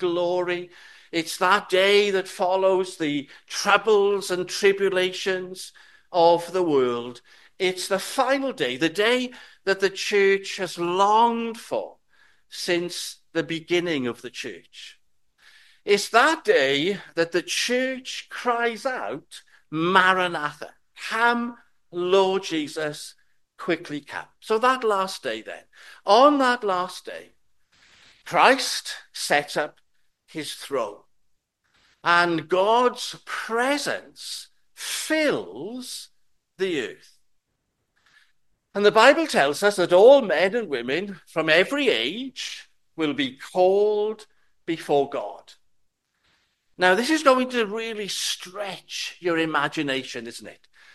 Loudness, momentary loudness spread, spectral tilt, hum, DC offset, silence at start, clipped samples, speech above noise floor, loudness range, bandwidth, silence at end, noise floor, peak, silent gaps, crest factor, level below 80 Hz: -22 LUFS; 16 LU; -3.5 dB/octave; none; under 0.1%; 0 s; under 0.1%; 53 dB; 8 LU; 12.5 kHz; 0.4 s; -76 dBFS; 0 dBFS; none; 24 dB; -72 dBFS